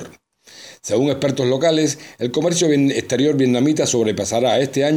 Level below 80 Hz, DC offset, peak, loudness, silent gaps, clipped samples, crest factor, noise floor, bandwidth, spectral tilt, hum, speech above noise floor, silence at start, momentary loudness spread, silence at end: -60 dBFS; under 0.1%; -6 dBFS; -18 LUFS; none; under 0.1%; 12 dB; -46 dBFS; 15.5 kHz; -4.5 dB/octave; none; 29 dB; 0 s; 6 LU; 0 s